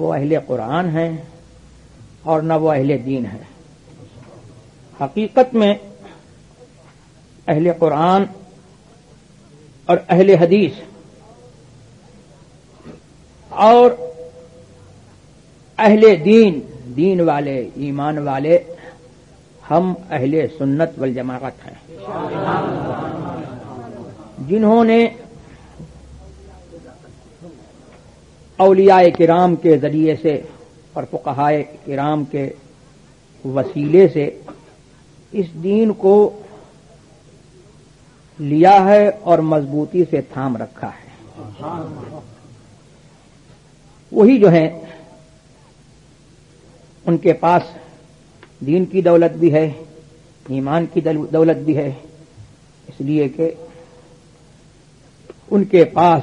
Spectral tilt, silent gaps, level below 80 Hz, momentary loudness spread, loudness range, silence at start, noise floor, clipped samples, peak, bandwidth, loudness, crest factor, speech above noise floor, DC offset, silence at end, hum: -8 dB/octave; none; -54 dBFS; 21 LU; 8 LU; 0 s; -48 dBFS; under 0.1%; 0 dBFS; 9.6 kHz; -15 LUFS; 18 dB; 34 dB; under 0.1%; 0 s; none